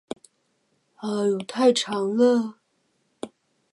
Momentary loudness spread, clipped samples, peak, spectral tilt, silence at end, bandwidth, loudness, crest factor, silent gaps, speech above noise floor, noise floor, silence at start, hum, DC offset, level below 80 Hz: 20 LU; under 0.1%; -8 dBFS; -4.5 dB/octave; 0.45 s; 11.5 kHz; -23 LUFS; 18 dB; none; 48 dB; -70 dBFS; 1 s; none; under 0.1%; -76 dBFS